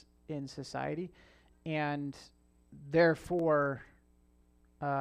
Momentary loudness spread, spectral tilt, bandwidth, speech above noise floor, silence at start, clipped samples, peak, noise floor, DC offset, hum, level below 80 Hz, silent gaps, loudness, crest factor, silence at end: 18 LU; -7 dB/octave; 12 kHz; 33 dB; 0.3 s; under 0.1%; -16 dBFS; -66 dBFS; under 0.1%; none; -64 dBFS; none; -34 LUFS; 20 dB; 0 s